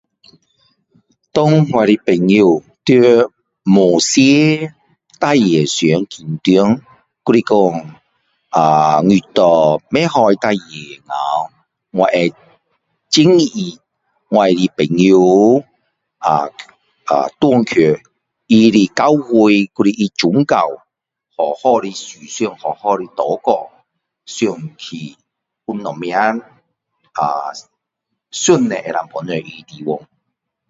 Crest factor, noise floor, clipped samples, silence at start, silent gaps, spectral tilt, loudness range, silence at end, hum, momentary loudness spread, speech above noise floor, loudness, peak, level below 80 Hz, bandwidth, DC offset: 14 dB; -76 dBFS; under 0.1%; 1.35 s; none; -5.5 dB/octave; 8 LU; 0.7 s; none; 16 LU; 63 dB; -14 LUFS; 0 dBFS; -56 dBFS; 8 kHz; under 0.1%